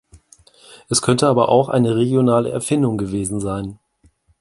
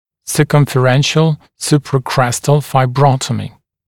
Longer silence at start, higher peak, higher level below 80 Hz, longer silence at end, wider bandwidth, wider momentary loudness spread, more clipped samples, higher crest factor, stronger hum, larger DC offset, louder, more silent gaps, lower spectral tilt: about the same, 0.15 s vs 0.25 s; about the same, 0 dBFS vs 0 dBFS; about the same, -48 dBFS vs -46 dBFS; first, 0.65 s vs 0.4 s; second, 11.5 kHz vs 16.5 kHz; about the same, 9 LU vs 8 LU; neither; about the same, 18 dB vs 14 dB; neither; neither; second, -18 LUFS vs -14 LUFS; neither; about the same, -5.5 dB/octave vs -5.5 dB/octave